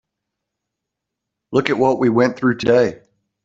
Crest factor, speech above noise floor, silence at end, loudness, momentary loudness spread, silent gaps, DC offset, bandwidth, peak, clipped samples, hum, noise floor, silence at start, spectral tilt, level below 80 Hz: 18 dB; 65 dB; 0.5 s; -17 LUFS; 5 LU; none; under 0.1%; 7.8 kHz; 0 dBFS; under 0.1%; none; -81 dBFS; 1.5 s; -6.5 dB/octave; -56 dBFS